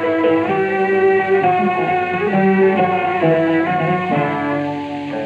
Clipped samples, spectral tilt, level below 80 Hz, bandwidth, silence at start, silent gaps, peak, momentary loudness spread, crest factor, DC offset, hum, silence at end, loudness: under 0.1%; -8.5 dB/octave; -60 dBFS; 7.4 kHz; 0 s; none; -4 dBFS; 6 LU; 12 dB; under 0.1%; none; 0 s; -16 LUFS